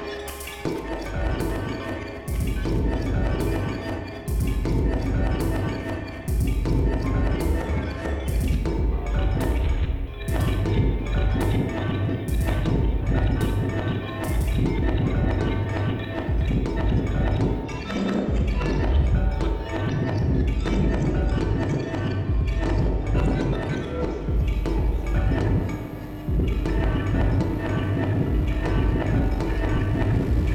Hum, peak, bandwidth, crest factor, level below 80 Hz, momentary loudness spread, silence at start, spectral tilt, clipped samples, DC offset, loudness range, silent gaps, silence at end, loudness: none; -10 dBFS; 16.5 kHz; 12 dB; -26 dBFS; 6 LU; 0 s; -7.5 dB/octave; under 0.1%; under 0.1%; 2 LU; none; 0 s; -25 LUFS